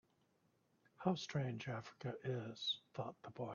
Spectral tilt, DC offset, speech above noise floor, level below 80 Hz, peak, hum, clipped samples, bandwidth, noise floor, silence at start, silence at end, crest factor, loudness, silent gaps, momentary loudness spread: -4.5 dB/octave; under 0.1%; 35 dB; -80 dBFS; -22 dBFS; none; under 0.1%; 7 kHz; -79 dBFS; 1 s; 0 s; 24 dB; -44 LUFS; none; 8 LU